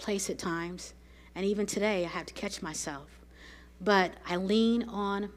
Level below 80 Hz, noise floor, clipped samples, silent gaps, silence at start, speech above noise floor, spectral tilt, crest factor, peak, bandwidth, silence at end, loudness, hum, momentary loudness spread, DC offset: -56 dBFS; -52 dBFS; under 0.1%; none; 0 s; 21 dB; -4 dB/octave; 22 dB; -10 dBFS; 15.5 kHz; 0 s; -31 LUFS; none; 19 LU; under 0.1%